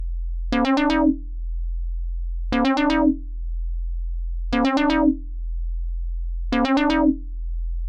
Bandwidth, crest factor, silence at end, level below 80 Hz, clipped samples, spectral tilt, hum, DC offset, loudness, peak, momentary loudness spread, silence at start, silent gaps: 7.8 kHz; 14 dB; 0 s; -28 dBFS; under 0.1%; -6.5 dB/octave; none; under 0.1%; -23 LUFS; -8 dBFS; 13 LU; 0 s; none